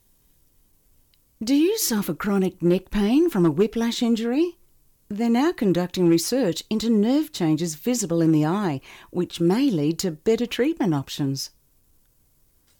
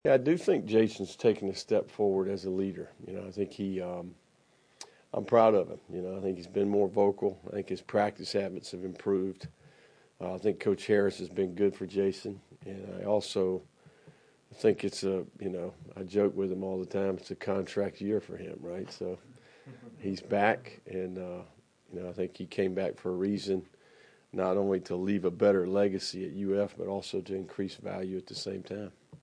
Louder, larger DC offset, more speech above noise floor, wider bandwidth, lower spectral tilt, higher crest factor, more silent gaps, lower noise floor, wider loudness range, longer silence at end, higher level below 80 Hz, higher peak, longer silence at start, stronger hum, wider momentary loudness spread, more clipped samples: first, -22 LUFS vs -32 LUFS; neither; first, 40 dB vs 35 dB; first, 19 kHz vs 10.5 kHz; about the same, -5.5 dB/octave vs -6 dB/octave; second, 14 dB vs 22 dB; neither; second, -61 dBFS vs -66 dBFS; about the same, 3 LU vs 5 LU; first, 1.35 s vs 0.05 s; first, -50 dBFS vs -72 dBFS; about the same, -10 dBFS vs -10 dBFS; first, 1.4 s vs 0.05 s; neither; second, 7 LU vs 15 LU; neither